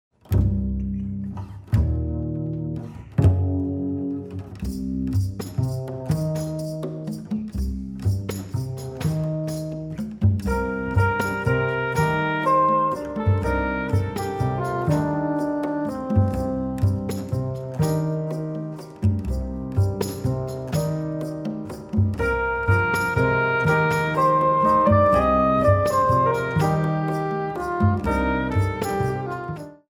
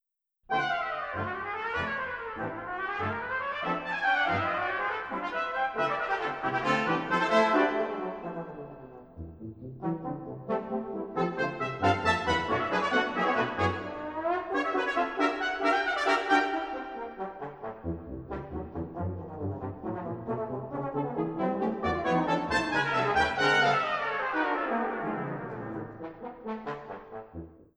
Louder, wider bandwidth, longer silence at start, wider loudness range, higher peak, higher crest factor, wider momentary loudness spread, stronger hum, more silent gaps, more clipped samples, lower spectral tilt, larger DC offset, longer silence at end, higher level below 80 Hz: first, -23 LUFS vs -30 LUFS; first, 19.5 kHz vs 11 kHz; second, 0.3 s vs 0.5 s; about the same, 9 LU vs 9 LU; first, -6 dBFS vs -10 dBFS; about the same, 16 dB vs 20 dB; second, 11 LU vs 14 LU; neither; neither; neither; first, -7.5 dB/octave vs -5.5 dB/octave; neither; about the same, 0.15 s vs 0.15 s; first, -36 dBFS vs -56 dBFS